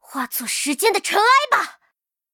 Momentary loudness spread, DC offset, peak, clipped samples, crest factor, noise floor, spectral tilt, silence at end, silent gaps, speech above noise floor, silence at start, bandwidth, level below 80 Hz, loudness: 10 LU; under 0.1%; -4 dBFS; under 0.1%; 16 dB; -70 dBFS; 0 dB/octave; 0.65 s; none; 51 dB; 0.1 s; 19 kHz; -70 dBFS; -18 LUFS